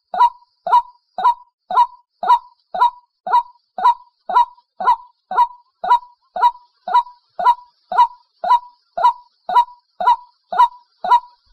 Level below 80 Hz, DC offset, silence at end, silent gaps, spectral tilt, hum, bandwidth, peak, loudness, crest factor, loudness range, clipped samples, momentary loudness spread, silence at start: -60 dBFS; under 0.1%; 0.35 s; 1.53-1.58 s, 3.20-3.24 s; -2 dB/octave; none; 11.5 kHz; -2 dBFS; -18 LUFS; 16 dB; 1 LU; under 0.1%; 12 LU; 0.15 s